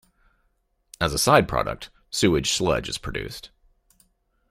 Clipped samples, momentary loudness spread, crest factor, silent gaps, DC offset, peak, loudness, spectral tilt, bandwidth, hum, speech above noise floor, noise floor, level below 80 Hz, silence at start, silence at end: under 0.1%; 16 LU; 24 dB; none; under 0.1%; -2 dBFS; -23 LUFS; -4 dB/octave; 16 kHz; none; 47 dB; -69 dBFS; -44 dBFS; 1 s; 1.05 s